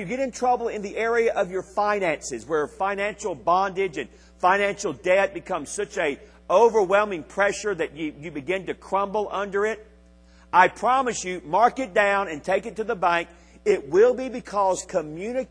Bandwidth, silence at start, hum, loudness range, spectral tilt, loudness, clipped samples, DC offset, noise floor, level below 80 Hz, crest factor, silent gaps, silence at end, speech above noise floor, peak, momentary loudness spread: 10.5 kHz; 0 s; none; 3 LU; -4 dB/octave; -24 LUFS; under 0.1%; under 0.1%; -52 dBFS; -54 dBFS; 22 dB; none; 0.05 s; 29 dB; -2 dBFS; 10 LU